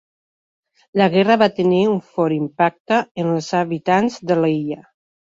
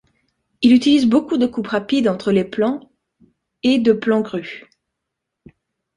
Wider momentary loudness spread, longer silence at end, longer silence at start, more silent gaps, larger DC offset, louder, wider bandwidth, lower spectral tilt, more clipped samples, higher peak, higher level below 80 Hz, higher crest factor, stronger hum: second, 7 LU vs 13 LU; second, 0.4 s vs 1.35 s; first, 0.95 s vs 0.6 s; first, 2.80-2.85 s, 3.11-3.15 s vs none; neither; about the same, -18 LUFS vs -17 LUFS; second, 7.8 kHz vs 10.5 kHz; about the same, -6.5 dB/octave vs -6 dB/octave; neither; about the same, -2 dBFS vs -2 dBFS; second, -62 dBFS vs -56 dBFS; about the same, 18 dB vs 16 dB; neither